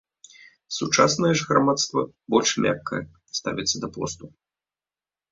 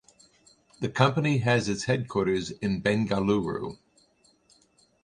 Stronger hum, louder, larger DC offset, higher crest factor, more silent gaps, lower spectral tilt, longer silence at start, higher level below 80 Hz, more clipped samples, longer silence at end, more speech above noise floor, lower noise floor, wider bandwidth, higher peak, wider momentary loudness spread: neither; first, -23 LUFS vs -27 LUFS; neither; about the same, 22 dB vs 24 dB; neither; second, -3.5 dB/octave vs -6 dB/octave; about the same, 0.7 s vs 0.8 s; about the same, -58 dBFS vs -56 dBFS; neither; second, 1.05 s vs 1.3 s; first, over 67 dB vs 38 dB; first, under -90 dBFS vs -64 dBFS; second, 7.8 kHz vs 11 kHz; about the same, -2 dBFS vs -4 dBFS; first, 13 LU vs 9 LU